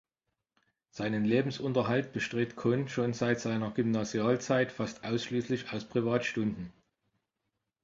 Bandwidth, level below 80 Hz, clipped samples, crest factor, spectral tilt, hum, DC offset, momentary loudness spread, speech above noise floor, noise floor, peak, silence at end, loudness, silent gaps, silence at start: 7.8 kHz; -66 dBFS; under 0.1%; 18 dB; -6 dB/octave; none; under 0.1%; 6 LU; 55 dB; -86 dBFS; -14 dBFS; 1.15 s; -31 LUFS; none; 0.95 s